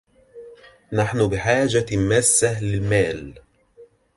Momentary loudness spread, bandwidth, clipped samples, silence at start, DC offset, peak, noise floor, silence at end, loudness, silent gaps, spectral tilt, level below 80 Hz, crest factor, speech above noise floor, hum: 10 LU; 11.5 kHz; under 0.1%; 0.35 s; under 0.1%; -4 dBFS; -51 dBFS; 0.3 s; -20 LUFS; none; -4.5 dB/octave; -44 dBFS; 18 dB; 31 dB; none